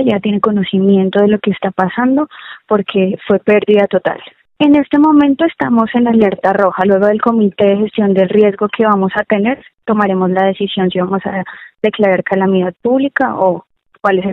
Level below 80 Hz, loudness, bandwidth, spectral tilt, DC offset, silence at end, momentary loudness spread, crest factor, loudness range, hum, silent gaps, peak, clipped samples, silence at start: -52 dBFS; -13 LUFS; 4.1 kHz; -9 dB/octave; under 0.1%; 0 s; 7 LU; 12 dB; 3 LU; none; none; 0 dBFS; under 0.1%; 0 s